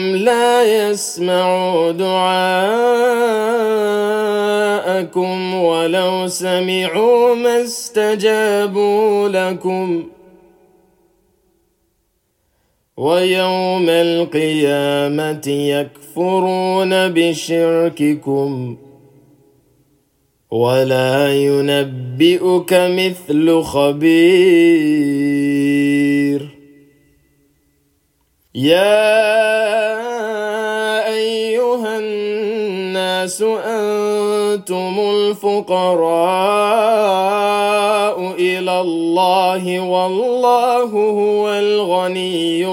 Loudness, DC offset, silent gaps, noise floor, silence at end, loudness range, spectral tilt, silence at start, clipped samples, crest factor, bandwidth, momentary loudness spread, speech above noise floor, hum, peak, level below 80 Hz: -15 LUFS; under 0.1%; none; -65 dBFS; 0 s; 6 LU; -5 dB/octave; 0 s; under 0.1%; 14 dB; 17 kHz; 7 LU; 50 dB; none; 0 dBFS; -62 dBFS